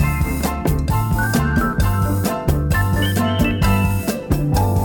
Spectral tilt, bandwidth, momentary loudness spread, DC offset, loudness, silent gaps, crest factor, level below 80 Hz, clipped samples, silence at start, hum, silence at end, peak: -6 dB/octave; 19.5 kHz; 3 LU; under 0.1%; -19 LUFS; none; 16 dB; -24 dBFS; under 0.1%; 0 s; none; 0 s; -2 dBFS